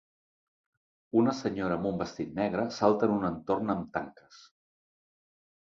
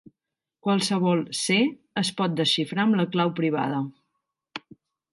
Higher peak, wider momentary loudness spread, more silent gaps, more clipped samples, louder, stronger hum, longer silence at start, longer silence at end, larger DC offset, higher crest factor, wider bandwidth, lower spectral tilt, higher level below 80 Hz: about the same, -8 dBFS vs -10 dBFS; second, 9 LU vs 14 LU; neither; neither; second, -30 LUFS vs -24 LUFS; neither; first, 1.15 s vs 0.65 s; first, 1.4 s vs 0.55 s; neither; first, 24 dB vs 16 dB; second, 7.6 kHz vs 11.5 kHz; first, -7 dB/octave vs -4.5 dB/octave; first, -62 dBFS vs -72 dBFS